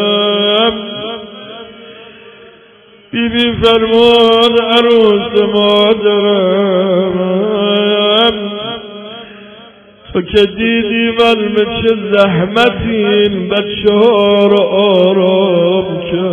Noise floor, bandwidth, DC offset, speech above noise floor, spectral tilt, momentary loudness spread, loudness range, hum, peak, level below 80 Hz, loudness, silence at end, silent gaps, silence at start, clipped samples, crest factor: -42 dBFS; 9 kHz; under 0.1%; 32 dB; -6.5 dB/octave; 13 LU; 5 LU; none; 0 dBFS; -40 dBFS; -11 LUFS; 0 s; none; 0 s; under 0.1%; 12 dB